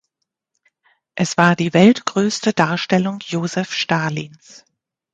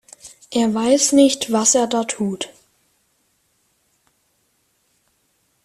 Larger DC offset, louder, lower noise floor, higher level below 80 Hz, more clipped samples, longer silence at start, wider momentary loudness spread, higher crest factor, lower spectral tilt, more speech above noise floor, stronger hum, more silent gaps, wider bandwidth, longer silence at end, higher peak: neither; about the same, -17 LUFS vs -17 LUFS; first, -77 dBFS vs -65 dBFS; about the same, -60 dBFS vs -62 dBFS; neither; first, 1.15 s vs 0.25 s; second, 11 LU vs 17 LU; about the same, 18 dB vs 20 dB; first, -5 dB/octave vs -3 dB/octave; first, 60 dB vs 49 dB; neither; neither; second, 9.2 kHz vs 14.5 kHz; second, 0.85 s vs 3.15 s; about the same, 0 dBFS vs -2 dBFS